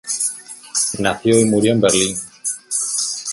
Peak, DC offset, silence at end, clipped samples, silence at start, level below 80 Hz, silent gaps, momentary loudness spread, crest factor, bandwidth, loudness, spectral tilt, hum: 0 dBFS; under 0.1%; 0 s; under 0.1%; 0.05 s; -52 dBFS; none; 10 LU; 18 dB; 12 kHz; -17 LUFS; -3.5 dB/octave; none